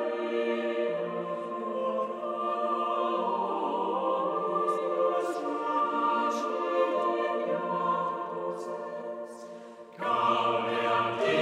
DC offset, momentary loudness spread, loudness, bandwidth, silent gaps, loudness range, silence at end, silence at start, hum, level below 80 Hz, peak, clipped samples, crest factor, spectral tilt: under 0.1%; 9 LU; -30 LUFS; 12 kHz; none; 3 LU; 0 s; 0 s; none; -84 dBFS; -14 dBFS; under 0.1%; 16 dB; -5.5 dB/octave